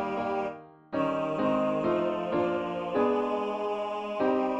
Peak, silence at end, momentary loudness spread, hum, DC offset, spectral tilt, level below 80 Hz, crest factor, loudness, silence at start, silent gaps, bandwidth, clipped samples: -14 dBFS; 0 s; 6 LU; none; under 0.1%; -7.5 dB/octave; -64 dBFS; 14 dB; -29 LUFS; 0 s; none; 8.2 kHz; under 0.1%